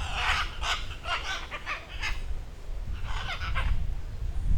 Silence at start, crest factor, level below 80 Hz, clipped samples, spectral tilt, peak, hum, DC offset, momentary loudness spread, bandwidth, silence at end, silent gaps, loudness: 0 s; 16 dB; -32 dBFS; under 0.1%; -3 dB/octave; -12 dBFS; none; under 0.1%; 12 LU; 13 kHz; 0 s; none; -33 LUFS